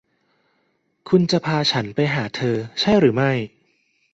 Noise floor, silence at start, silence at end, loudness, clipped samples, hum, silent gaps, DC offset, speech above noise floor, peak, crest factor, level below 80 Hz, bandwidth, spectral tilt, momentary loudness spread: -68 dBFS; 1.05 s; 0.65 s; -20 LUFS; under 0.1%; none; none; under 0.1%; 49 dB; -4 dBFS; 18 dB; -56 dBFS; 8 kHz; -6 dB/octave; 7 LU